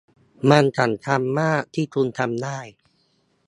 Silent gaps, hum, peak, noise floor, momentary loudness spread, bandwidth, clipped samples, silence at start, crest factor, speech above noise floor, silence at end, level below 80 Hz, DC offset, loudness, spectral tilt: none; none; 0 dBFS; -65 dBFS; 11 LU; 11.5 kHz; under 0.1%; 0.45 s; 22 dB; 45 dB; 0.75 s; -64 dBFS; under 0.1%; -21 LUFS; -6.5 dB/octave